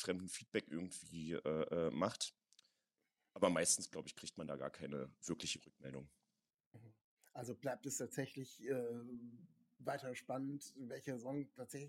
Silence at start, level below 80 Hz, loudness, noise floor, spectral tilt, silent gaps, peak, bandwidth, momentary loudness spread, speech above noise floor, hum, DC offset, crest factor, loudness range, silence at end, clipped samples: 0 s; -78 dBFS; -44 LUFS; under -90 dBFS; -3.5 dB/octave; 6.66-6.71 s, 7.01-7.17 s; -20 dBFS; 16.5 kHz; 15 LU; over 46 dB; none; under 0.1%; 26 dB; 8 LU; 0 s; under 0.1%